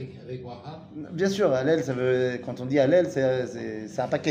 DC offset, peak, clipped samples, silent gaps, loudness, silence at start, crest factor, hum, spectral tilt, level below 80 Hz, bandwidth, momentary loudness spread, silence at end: under 0.1%; -10 dBFS; under 0.1%; none; -25 LUFS; 0 s; 16 dB; none; -6.5 dB/octave; -64 dBFS; 15 kHz; 17 LU; 0 s